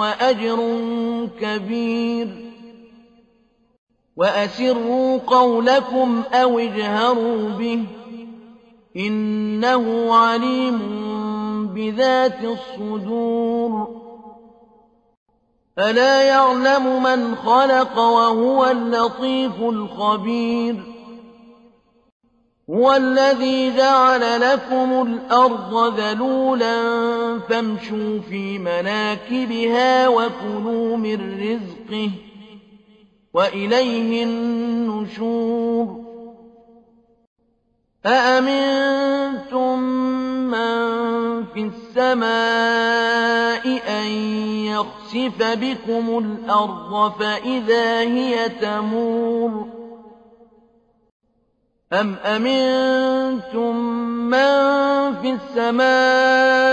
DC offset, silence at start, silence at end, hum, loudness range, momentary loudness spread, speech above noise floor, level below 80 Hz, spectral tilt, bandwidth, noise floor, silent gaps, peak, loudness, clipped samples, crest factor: under 0.1%; 0 s; 0 s; none; 8 LU; 10 LU; 48 dB; -60 dBFS; -5 dB/octave; 8.6 kHz; -66 dBFS; 3.78-3.87 s, 15.17-15.26 s, 22.12-22.20 s, 37.27-37.36 s, 51.12-51.20 s; -4 dBFS; -19 LUFS; under 0.1%; 16 dB